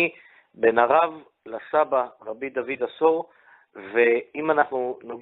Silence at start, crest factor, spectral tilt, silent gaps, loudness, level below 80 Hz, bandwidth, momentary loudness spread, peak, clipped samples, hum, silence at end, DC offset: 0 s; 20 dB; -8.5 dB/octave; none; -23 LUFS; -72 dBFS; 4.1 kHz; 16 LU; -4 dBFS; under 0.1%; none; 0 s; under 0.1%